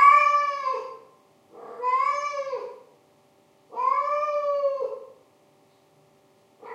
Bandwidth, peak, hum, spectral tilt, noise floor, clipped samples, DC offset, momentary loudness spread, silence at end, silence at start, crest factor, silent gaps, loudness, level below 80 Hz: 9 kHz; -4 dBFS; none; -1.5 dB/octave; -60 dBFS; under 0.1%; under 0.1%; 20 LU; 0 s; 0 s; 22 dB; none; -24 LUFS; under -90 dBFS